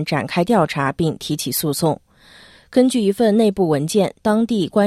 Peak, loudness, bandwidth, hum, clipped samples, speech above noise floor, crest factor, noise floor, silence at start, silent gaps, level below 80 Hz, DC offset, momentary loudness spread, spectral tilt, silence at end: -2 dBFS; -18 LUFS; 15.5 kHz; none; under 0.1%; 29 dB; 16 dB; -47 dBFS; 0 s; none; -52 dBFS; under 0.1%; 6 LU; -5.5 dB/octave; 0 s